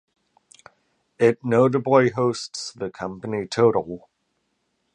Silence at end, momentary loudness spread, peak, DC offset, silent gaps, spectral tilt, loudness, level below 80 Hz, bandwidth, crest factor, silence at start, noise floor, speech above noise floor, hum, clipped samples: 0.95 s; 13 LU; -2 dBFS; under 0.1%; none; -6 dB/octave; -22 LUFS; -62 dBFS; 10 kHz; 22 dB; 1.2 s; -73 dBFS; 52 dB; none; under 0.1%